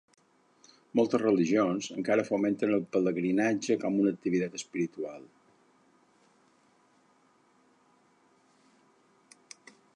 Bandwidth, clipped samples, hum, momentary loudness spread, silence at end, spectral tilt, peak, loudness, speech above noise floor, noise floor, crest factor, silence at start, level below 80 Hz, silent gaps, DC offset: 10.5 kHz; under 0.1%; none; 15 LU; 4.75 s; -6 dB/octave; -12 dBFS; -29 LUFS; 38 dB; -66 dBFS; 20 dB; 0.95 s; -78 dBFS; none; under 0.1%